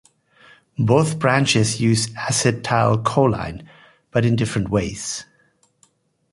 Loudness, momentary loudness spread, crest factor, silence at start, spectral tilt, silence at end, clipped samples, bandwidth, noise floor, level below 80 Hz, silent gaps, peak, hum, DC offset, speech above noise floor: -19 LUFS; 11 LU; 18 dB; 0.8 s; -5 dB/octave; 1.1 s; under 0.1%; 11.5 kHz; -61 dBFS; -46 dBFS; none; -2 dBFS; none; under 0.1%; 42 dB